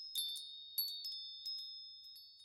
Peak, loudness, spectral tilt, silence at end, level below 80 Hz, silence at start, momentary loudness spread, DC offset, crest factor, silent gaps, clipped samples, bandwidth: -26 dBFS; -43 LUFS; 5 dB/octave; 0 s; under -90 dBFS; 0 s; 12 LU; under 0.1%; 20 dB; none; under 0.1%; 16 kHz